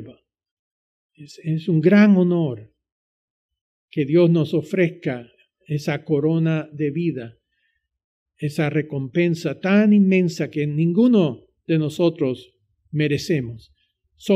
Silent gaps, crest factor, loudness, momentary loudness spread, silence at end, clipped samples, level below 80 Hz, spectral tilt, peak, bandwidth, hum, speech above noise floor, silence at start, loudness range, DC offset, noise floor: 0.51-1.09 s, 2.92-3.49 s, 3.61-3.88 s, 8.04-8.26 s; 16 dB; -20 LUFS; 15 LU; 0 s; under 0.1%; -64 dBFS; -8 dB/octave; -4 dBFS; 12.5 kHz; none; 52 dB; 0 s; 6 LU; under 0.1%; -71 dBFS